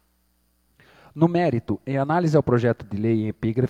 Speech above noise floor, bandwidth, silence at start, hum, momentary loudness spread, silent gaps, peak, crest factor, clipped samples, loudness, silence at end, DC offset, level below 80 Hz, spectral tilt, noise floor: 44 dB; 8.8 kHz; 1.15 s; none; 7 LU; none; -6 dBFS; 18 dB; under 0.1%; -22 LUFS; 0 s; under 0.1%; -54 dBFS; -9 dB/octave; -66 dBFS